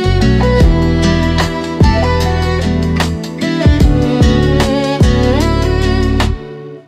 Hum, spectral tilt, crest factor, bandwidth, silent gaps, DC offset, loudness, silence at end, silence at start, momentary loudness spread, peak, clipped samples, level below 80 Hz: none; -6.5 dB/octave; 10 dB; 14 kHz; none; under 0.1%; -12 LUFS; 0.1 s; 0 s; 6 LU; 0 dBFS; under 0.1%; -16 dBFS